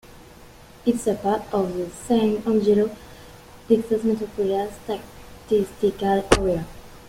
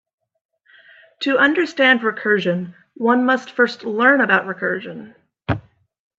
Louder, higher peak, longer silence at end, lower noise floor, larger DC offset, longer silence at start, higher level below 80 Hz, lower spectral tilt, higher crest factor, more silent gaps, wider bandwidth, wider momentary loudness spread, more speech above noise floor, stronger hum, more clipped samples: second, -23 LUFS vs -18 LUFS; about the same, -2 dBFS vs 0 dBFS; second, 0 s vs 0.6 s; second, -46 dBFS vs -50 dBFS; neither; second, 0.4 s vs 1.2 s; first, -42 dBFS vs -56 dBFS; about the same, -5.5 dB/octave vs -6 dB/octave; about the same, 22 dB vs 18 dB; neither; first, 16 kHz vs 7.8 kHz; about the same, 12 LU vs 12 LU; second, 24 dB vs 32 dB; neither; neither